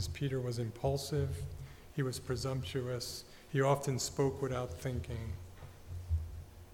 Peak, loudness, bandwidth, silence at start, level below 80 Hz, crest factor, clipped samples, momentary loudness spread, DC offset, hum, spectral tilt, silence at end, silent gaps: -18 dBFS; -37 LUFS; 18 kHz; 0 s; -50 dBFS; 20 dB; under 0.1%; 15 LU; under 0.1%; none; -5.5 dB/octave; 0 s; none